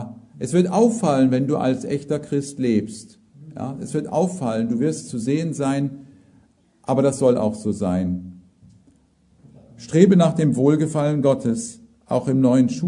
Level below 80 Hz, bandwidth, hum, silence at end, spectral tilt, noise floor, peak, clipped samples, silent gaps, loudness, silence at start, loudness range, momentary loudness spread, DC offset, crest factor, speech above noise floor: -60 dBFS; 11 kHz; none; 0 s; -7 dB/octave; -58 dBFS; 0 dBFS; under 0.1%; none; -20 LUFS; 0 s; 5 LU; 14 LU; under 0.1%; 20 dB; 38 dB